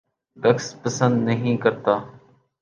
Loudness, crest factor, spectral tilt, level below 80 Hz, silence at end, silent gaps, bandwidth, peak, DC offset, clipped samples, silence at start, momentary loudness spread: -22 LUFS; 18 dB; -6 dB/octave; -62 dBFS; 0.45 s; none; 9 kHz; -4 dBFS; under 0.1%; under 0.1%; 0.35 s; 4 LU